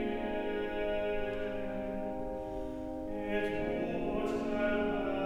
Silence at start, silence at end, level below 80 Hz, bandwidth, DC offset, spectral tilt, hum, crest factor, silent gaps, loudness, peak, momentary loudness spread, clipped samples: 0 s; 0 s; -48 dBFS; 13.5 kHz; under 0.1%; -7 dB/octave; none; 14 dB; none; -36 LUFS; -20 dBFS; 7 LU; under 0.1%